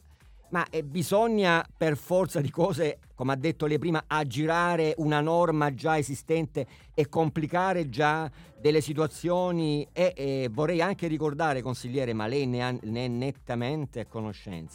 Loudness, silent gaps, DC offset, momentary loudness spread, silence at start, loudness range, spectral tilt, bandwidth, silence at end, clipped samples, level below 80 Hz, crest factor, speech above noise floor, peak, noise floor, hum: -28 LUFS; none; under 0.1%; 8 LU; 0.5 s; 3 LU; -6 dB/octave; 18 kHz; 0 s; under 0.1%; -56 dBFS; 18 dB; 27 dB; -10 dBFS; -54 dBFS; none